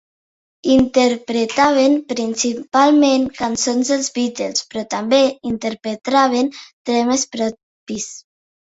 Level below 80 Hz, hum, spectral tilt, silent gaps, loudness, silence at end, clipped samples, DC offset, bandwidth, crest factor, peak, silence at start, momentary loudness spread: -52 dBFS; none; -3 dB/octave; 6.73-6.85 s, 7.63-7.86 s; -17 LUFS; 0.55 s; under 0.1%; under 0.1%; 8 kHz; 16 dB; -2 dBFS; 0.65 s; 12 LU